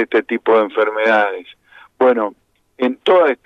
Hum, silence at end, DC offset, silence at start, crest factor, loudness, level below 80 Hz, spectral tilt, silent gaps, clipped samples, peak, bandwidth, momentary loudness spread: none; 0.1 s; under 0.1%; 0 s; 14 dB; -16 LUFS; -70 dBFS; -5.5 dB/octave; none; under 0.1%; -2 dBFS; 6.6 kHz; 8 LU